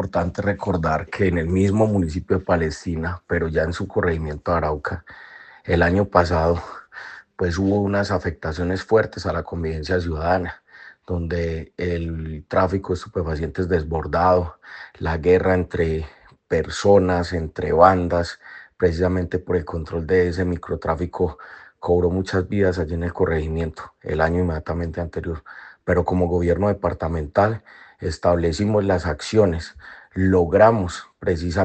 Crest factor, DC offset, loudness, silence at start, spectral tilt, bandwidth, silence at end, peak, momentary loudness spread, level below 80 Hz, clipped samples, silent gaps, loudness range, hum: 22 dB; under 0.1%; -22 LUFS; 0 s; -7 dB/octave; 8.8 kHz; 0 s; 0 dBFS; 13 LU; -40 dBFS; under 0.1%; none; 4 LU; none